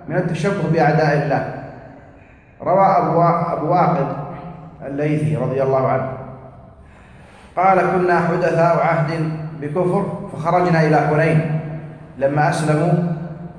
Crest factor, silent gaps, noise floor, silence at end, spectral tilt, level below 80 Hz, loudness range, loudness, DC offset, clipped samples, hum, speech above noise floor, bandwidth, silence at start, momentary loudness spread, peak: 16 dB; none; -45 dBFS; 0 s; -8 dB/octave; -50 dBFS; 3 LU; -18 LUFS; under 0.1%; under 0.1%; none; 29 dB; 10.5 kHz; 0 s; 14 LU; -2 dBFS